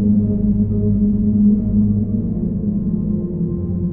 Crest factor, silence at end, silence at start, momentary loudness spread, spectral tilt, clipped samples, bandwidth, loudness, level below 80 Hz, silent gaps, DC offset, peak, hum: 12 dB; 0 s; 0 s; 6 LU; -15.5 dB/octave; under 0.1%; 1.3 kHz; -18 LUFS; -30 dBFS; none; under 0.1%; -4 dBFS; none